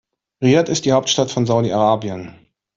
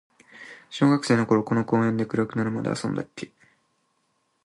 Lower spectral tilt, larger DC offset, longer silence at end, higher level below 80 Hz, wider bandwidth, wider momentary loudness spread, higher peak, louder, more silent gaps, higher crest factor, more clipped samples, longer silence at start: second, -5 dB/octave vs -6.5 dB/octave; neither; second, 0.45 s vs 1.2 s; first, -56 dBFS vs -64 dBFS; second, 7.8 kHz vs 11.5 kHz; second, 6 LU vs 20 LU; first, -2 dBFS vs -6 dBFS; first, -17 LUFS vs -24 LUFS; neither; about the same, 16 dB vs 18 dB; neither; about the same, 0.4 s vs 0.35 s